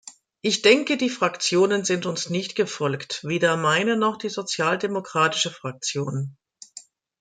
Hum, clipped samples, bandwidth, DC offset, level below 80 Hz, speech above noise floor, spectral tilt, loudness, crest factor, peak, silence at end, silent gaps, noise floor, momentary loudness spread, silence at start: none; under 0.1%; 9.4 kHz; under 0.1%; -70 dBFS; 25 dB; -3.5 dB/octave; -23 LUFS; 22 dB; -2 dBFS; 0.4 s; none; -48 dBFS; 10 LU; 0.05 s